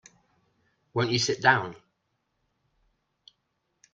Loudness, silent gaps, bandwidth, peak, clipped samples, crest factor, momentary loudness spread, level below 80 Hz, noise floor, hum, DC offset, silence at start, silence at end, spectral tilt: -25 LUFS; none; 9.2 kHz; -6 dBFS; under 0.1%; 26 dB; 12 LU; -66 dBFS; -77 dBFS; none; under 0.1%; 0.95 s; 2.2 s; -3.5 dB/octave